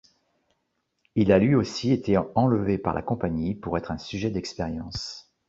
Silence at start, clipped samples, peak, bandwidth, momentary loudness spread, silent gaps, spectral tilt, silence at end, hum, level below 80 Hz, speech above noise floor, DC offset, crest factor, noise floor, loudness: 1.15 s; under 0.1%; -6 dBFS; 7.8 kHz; 12 LU; none; -7 dB/octave; 0.25 s; none; -48 dBFS; 52 dB; under 0.1%; 20 dB; -76 dBFS; -25 LUFS